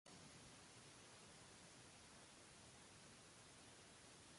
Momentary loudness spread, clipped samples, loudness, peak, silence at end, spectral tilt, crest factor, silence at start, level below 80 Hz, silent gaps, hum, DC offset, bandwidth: 1 LU; under 0.1%; -63 LUFS; -50 dBFS; 0 s; -2.5 dB/octave; 16 dB; 0.05 s; -82 dBFS; none; none; under 0.1%; 11.5 kHz